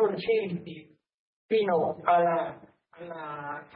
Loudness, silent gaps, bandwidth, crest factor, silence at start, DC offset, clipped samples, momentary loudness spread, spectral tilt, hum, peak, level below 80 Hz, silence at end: -28 LUFS; 1.14-1.49 s; 5.2 kHz; 20 dB; 0 s; under 0.1%; under 0.1%; 19 LU; -10 dB/octave; none; -8 dBFS; -74 dBFS; 0.1 s